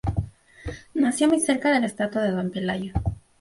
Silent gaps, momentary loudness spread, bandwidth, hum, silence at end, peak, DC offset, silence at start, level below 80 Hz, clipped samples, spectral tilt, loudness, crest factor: none; 17 LU; 11.5 kHz; none; 0.2 s; -8 dBFS; under 0.1%; 0.05 s; -40 dBFS; under 0.1%; -5 dB/octave; -24 LUFS; 16 dB